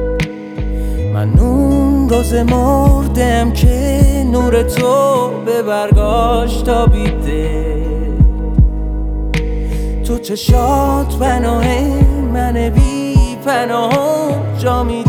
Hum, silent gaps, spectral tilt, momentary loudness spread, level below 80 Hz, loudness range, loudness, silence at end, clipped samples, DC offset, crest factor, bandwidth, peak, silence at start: none; none; -7 dB/octave; 7 LU; -16 dBFS; 3 LU; -14 LUFS; 0 s; under 0.1%; under 0.1%; 12 dB; 16.5 kHz; 0 dBFS; 0 s